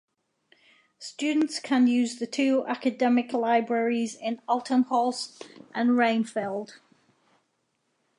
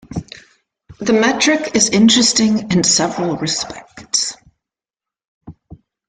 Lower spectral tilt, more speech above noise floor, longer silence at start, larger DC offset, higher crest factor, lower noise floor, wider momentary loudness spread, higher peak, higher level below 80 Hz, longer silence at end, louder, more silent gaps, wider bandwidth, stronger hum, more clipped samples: about the same, -4 dB/octave vs -3 dB/octave; second, 49 dB vs 73 dB; first, 1 s vs 0.1 s; neither; about the same, 18 dB vs 16 dB; second, -75 dBFS vs -88 dBFS; about the same, 13 LU vs 15 LU; second, -10 dBFS vs 0 dBFS; second, -82 dBFS vs -50 dBFS; first, 1.45 s vs 0.35 s; second, -26 LUFS vs -14 LUFS; second, none vs 5.28-5.41 s; first, 11 kHz vs 9.6 kHz; neither; neither